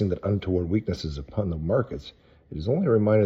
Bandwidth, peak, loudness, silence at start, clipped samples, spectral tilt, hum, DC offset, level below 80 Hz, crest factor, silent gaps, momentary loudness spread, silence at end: 7.6 kHz; -10 dBFS; -26 LUFS; 0 s; under 0.1%; -8.5 dB/octave; none; under 0.1%; -44 dBFS; 16 dB; none; 14 LU; 0 s